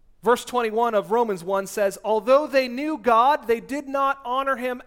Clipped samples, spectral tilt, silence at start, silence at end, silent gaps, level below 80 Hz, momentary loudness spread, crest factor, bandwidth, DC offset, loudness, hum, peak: under 0.1%; -4 dB/octave; 0.25 s; 0.05 s; none; -58 dBFS; 7 LU; 16 dB; 17 kHz; under 0.1%; -22 LUFS; none; -6 dBFS